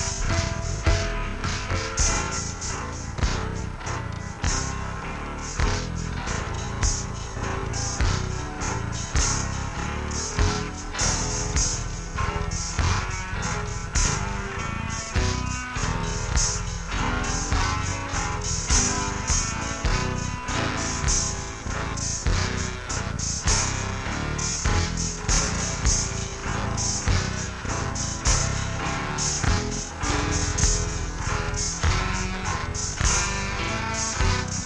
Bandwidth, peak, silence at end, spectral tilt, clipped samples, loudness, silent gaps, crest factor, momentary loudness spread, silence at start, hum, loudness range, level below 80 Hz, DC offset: 10.5 kHz; -6 dBFS; 0 s; -3 dB/octave; under 0.1%; -26 LUFS; none; 18 dB; 7 LU; 0 s; none; 3 LU; -30 dBFS; under 0.1%